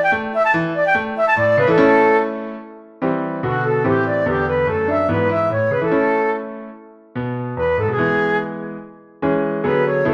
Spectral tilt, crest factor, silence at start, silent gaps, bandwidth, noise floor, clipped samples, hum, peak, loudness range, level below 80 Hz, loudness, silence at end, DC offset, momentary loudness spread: -8 dB/octave; 18 dB; 0 s; none; 7.4 kHz; -39 dBFS; under 0.1%; none; -2 dBFS; 4 LU; -48 dBFS; -18 LUFS; 0 s; under 0.1%; 14 LU